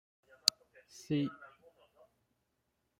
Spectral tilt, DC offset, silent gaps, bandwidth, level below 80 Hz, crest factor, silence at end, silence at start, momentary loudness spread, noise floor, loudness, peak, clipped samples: -3.5 dB/octave; under 0.1%; none; 16 kHz; -78 dBFS; 36 dB; 1.55 s; 0.45 s; 24 LU; -82 dBFS; -34 LUFS; -4 dBFS; under 0.1%